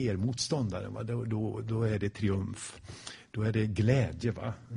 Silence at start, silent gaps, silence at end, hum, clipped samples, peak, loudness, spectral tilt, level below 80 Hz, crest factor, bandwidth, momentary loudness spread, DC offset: 0 s; none; 0 s; none; under 0.1%; -12 dBFS; -32 LUFS; -6 dB/octave; -54 dBFS; 18 dB; 10.5 kHz; 14 LU; under 0.1%